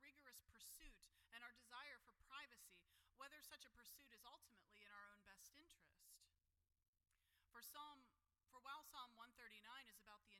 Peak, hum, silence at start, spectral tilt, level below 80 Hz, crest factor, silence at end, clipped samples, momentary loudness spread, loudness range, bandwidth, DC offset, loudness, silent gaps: -46 dBFS; none; 0 s; -0.5 dB/octave; -82 dBFS; 20 dB; 0 s; under 0.1%; 8 LU; 6 LU; 17 kHz; under 0.1%; -63 LUFS; 6.88-6.93 s